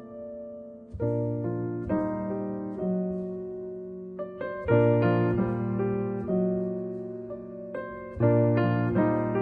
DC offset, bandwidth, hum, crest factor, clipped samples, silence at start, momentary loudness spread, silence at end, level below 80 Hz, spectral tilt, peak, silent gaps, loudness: under 0.1%; 4.9 kHz; none; 18 dB; under 0.1%; 0 s; 16 LU; 0 s; -52 dBFS; -11.5 dB/octave; -10 dBFS; none; -28 LUFS